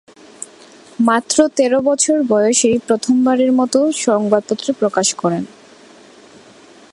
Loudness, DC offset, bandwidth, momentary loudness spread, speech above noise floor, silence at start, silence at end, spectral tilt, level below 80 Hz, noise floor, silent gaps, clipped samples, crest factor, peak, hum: -15 LUFS; under 0.1%; 11.5 kHz; 17 LU; 29 dB; 1 s; 1.45 s; -3.5 dB/octave; -62 dBFS; -43 dBFS; none; under 0.1%; 16 dB; 0 dBFS; none